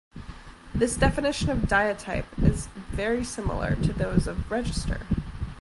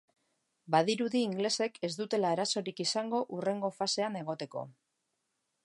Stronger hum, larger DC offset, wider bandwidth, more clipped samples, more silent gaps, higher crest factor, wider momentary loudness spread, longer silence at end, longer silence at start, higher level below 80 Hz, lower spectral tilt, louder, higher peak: neither; neither; about the same, 11.5 kHz vs 11.5 kHz; neither; neither; about the same, 20 dB vs 22 dB; first, 12 LU vs 9 LU; second, 0 s vs 0.95 s; second, 0.15 s vs 0.65 s; first, -34 dBFS vs -84 dBFS; first, -5.5 dB/octave vs -4 dB/octave; first, -27 LUFS vs -32 LUFS; first, -8 dBFS vs -12 dBFS